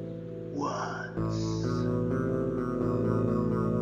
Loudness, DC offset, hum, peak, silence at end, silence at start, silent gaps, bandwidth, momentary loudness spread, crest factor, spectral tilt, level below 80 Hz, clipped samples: -30 LUFS; under 0.1%; none; -14 dBFS; 0 s; 0 s; none; 8.4 kHz; 6 LU; 14 dB; -8 dB/octave; -48 dBFS; under 0.1%